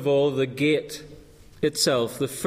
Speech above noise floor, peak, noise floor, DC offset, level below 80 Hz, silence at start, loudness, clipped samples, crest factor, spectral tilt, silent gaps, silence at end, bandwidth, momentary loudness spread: 24 dB; -10 dBFS; -47 dBFS; under 0.1%; -56 dBFS; 0 s; -24 LUFS; under 0.1%; 16 dB; -4 dB/octave; none; 0 s; 15.5 kHz; 9 LU